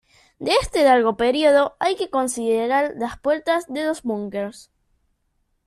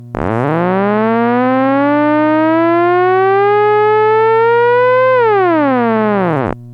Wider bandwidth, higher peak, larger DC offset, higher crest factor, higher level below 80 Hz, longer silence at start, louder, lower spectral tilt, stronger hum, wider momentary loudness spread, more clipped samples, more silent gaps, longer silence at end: first, 13.5 kHz vs 5.8 kHz; second, -4 dBFS vs 0 dBFS; neither; first, 18 dB vs 10 dB; about the same, -48 dBFS vs -46 dBFS; first, 0.4 s vs 0 s; second, -20 LUFS vs -11 LUFS; second, -3.5 dB/octave vs -9 dB/octave; second, none vs 60 Hz at -30 dBFS; first, 10 LU vs 4 LU; neither; neither; first, 1.05 s vs 0 s